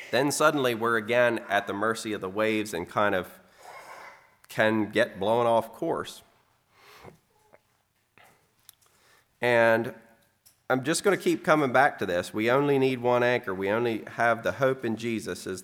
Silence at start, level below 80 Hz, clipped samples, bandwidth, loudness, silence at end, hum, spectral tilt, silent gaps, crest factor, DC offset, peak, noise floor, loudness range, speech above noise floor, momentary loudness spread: 0 s; -72 dBFS; under 0.1%; 17.5 kHz; -26 LUFS; 0 s; none; -4.5 dB/octave; none; 22 dB; under 0.1%; -6 dBFS; -71 dBFS; 6 LU; 45 dB; 10 LU